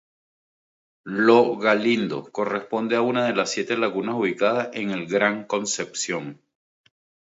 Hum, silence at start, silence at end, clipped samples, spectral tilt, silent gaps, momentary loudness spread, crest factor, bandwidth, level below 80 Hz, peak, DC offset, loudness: none; 1.05 s; 1 s; under 0.1%; -4 dB/octave; none; 10 LU; 20 dB; 8 kHz; -72 dBFS; -4 dBFS; under 0.1%; -23 LUFS